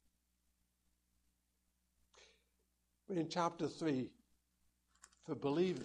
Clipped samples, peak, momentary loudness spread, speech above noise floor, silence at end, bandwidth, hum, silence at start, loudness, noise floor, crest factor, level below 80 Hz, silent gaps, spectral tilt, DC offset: under 0.1%; -22 dBFS; 12 LU; 44 dB; 0 s; 11 kHz; 60 Hz at -75 dBFS; 2.15 s; -41 LUFS; -82 dBFS; 22 dB; -80 dBFS; none; -6 dB/octave; under 0.1%